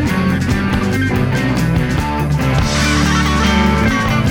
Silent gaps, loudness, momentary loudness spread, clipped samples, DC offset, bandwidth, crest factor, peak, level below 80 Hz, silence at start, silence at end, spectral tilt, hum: none; -15 LUFS; 3 LU; under 0.1%; under 0.1%; 18.5 kHz; 12 dB; -2 dBFS; -24 dBFS; 0 s; 0 s; -5.5 dB/octave; none